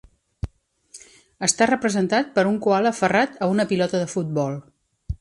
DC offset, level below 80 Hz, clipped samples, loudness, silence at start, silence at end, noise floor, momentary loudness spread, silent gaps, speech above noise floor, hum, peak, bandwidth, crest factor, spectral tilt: under 0.1%; -44 dBFS; under 0.1%; -21 LUFS; 0.45 s; 0.05 s; -50 dBFS; 16 LU; none; 30 dB; none; -6 dBFS; 11.5 kHz; 18 dB; -4.5 dB/octave